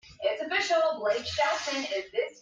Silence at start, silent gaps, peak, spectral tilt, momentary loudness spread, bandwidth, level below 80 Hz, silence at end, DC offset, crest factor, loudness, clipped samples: 0.05 s; none; -14 dBFS; -2 dB/octave; 5 LU; 9.2 kHz; -66 dBFS; 0 s; under 0.1%; 16 dB; -28 LUFS; under 0.1%